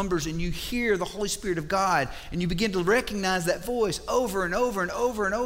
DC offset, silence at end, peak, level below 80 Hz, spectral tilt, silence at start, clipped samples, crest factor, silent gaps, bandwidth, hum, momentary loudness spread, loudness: under 0.1%; 0 s; -10 dBFS; -42 dBFS; -4.5 dB/octave; 0 s; under 0.1%; 16 dB; none; 16 kHz; none; 6 LU; -27 LUFS